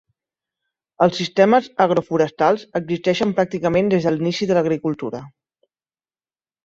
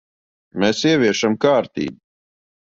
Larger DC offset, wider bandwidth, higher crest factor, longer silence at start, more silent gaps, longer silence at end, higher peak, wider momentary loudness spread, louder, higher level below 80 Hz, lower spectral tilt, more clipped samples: neither; about the same, 7.8 kHz vs 7.8 kHz; about the same, 18 dB vs 18 dB; first, 1 s vs 0.55 s; neither; first, 1.35 s vs 0.65 s; about the same, -2 dBFS vs -2 dBFS; second, 8 LU vs 12 LU; about the same, -19 LUFS vs -18 LUFS; about the same, -56 dBFS vs -58 dBFS; first, -6.5 dB/octave vs -4.5 dB/octave; neither